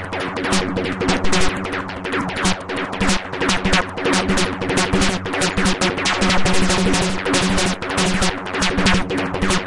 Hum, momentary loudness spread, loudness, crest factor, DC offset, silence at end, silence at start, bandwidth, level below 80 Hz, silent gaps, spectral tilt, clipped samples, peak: none; 6 LU; -19 LUFS; 16 dB; under 0.1%; 0 s; 0 s; 11.5 kHz; -32 dBFS; none; -3.5 dB/octave; under 0.1%; -4 dBFS